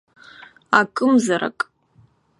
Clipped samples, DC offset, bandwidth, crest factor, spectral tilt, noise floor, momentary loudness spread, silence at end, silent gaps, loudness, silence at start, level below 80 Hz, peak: under 0.1%; under 0.1%; 11.5 kHz; 22 dB; -4.5 dB/octave; -56 dBFS; 11 LU; 0.75 s; none; -19 LUFS; 0.7 s; -68 dBFS; 0 dBFS